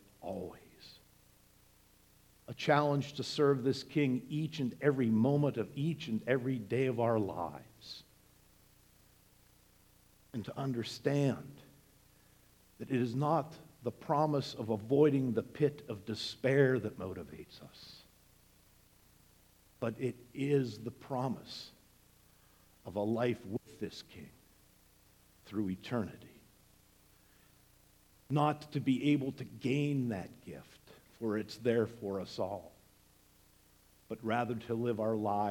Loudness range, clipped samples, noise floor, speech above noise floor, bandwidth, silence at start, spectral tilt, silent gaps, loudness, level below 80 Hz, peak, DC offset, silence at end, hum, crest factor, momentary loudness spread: 11 LU; under 0.1%; -66 dBFS; 32 dB; 18.5 kHz; 0.2 s; -7 dB/octave; none; -35 LUFS; -70 dBFS; -14 dBFS; under 0.1%; 0 s; 60 Hz at -70 dBFS; 22 dB; 20 LU